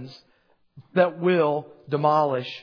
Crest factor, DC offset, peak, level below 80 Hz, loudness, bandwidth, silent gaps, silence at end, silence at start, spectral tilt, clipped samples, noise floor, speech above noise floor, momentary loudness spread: 20 dB; under 0.1%; -6 dBFS; -74 dBFS; -23 LUFS; 5.4 kHz; none; 0 s; 0 s; -8 dB/octave; under 0.1%; -64 dBFS; 41 dB; 10 LU